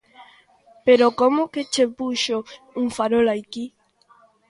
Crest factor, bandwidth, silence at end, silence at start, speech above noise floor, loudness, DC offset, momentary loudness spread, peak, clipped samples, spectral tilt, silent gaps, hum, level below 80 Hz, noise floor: 18 dB; 11.5 kHz; 0.8 s; 0.2 s; 36 dB; -20 LUFS; under 0.1%; 17 LU; -4 dBFS; under 0.1%; -3.5 dB/octave; none; none; -62 dBFS; -57 dBFS